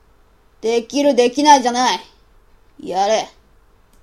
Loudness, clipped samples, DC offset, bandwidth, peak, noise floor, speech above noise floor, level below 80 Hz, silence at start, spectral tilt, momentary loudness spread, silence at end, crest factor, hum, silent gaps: -16 LUFS; under 0.1%; under 0.1%; 14 kHz; 0 dBFS; -53 dBFS; 37 dB; -54 dBFS; 0.65 s; -2.5 dB/octave; 14 LU; 0.75 s; 18 dB; none; none